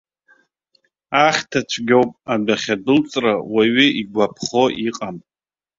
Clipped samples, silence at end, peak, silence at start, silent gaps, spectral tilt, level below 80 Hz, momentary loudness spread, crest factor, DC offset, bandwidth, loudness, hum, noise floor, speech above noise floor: under 0.1%; 0.6 s; 0 dBFS; 1.1 s; none; -4 dB/octave; -58 dBFS; 8 LU; 18 dB; under 0.1%; 7.8 kHz; -18 LUFS; none; under -90 dBFS; over 72 dB